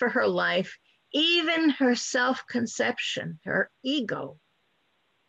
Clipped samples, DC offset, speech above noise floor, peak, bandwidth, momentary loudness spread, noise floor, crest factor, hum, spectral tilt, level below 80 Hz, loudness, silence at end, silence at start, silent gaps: under 0.1%; under 0.1%; 45 dB; -12 dBFS; 8.6 kHz; 11 LU; -71 dBFS; 14 dB; none; -3.5 dB/octave; -72 dBFS; -26 LUFS; 0.95 s; 0 s; none